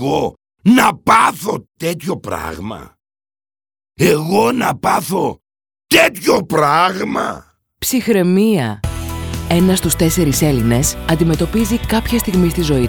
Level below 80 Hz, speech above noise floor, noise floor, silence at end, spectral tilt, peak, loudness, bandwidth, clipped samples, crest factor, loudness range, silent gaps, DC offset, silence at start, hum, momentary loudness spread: -32 dBFS; over 76 dB; under -90 dBFS; 0 s; -5 dB/octave; 0 dBFS; -15 LUFS; over 20 kHz; under 0.1%; 16 dB; 4 LU; none; under 0.1%; 0 s; none; 12 LU